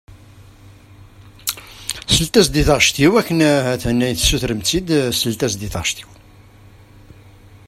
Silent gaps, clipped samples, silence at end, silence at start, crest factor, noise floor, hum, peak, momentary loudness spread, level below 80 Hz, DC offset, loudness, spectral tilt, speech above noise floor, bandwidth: none; under 0.1%; 0.1 s; 0.4 s; 18 dB; -44 dBFS; none; 0 dBFS; 12 LU; -34 dBFS; under 0.1%; -17 LUFS; -4 dB/octave; 28 dB; 16 kHz